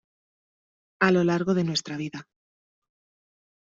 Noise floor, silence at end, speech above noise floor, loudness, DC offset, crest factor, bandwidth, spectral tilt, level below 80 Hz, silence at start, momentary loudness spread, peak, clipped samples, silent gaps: under -90 dBFS; 1.4 s; over 66 dB; -24 LUFS; under 0.1%; 22 dB; 7.8 kHz; -4.5 dB/octave; -68 dBFS; 1 s; 14 LU; -8 dBFS; under 0.1%; none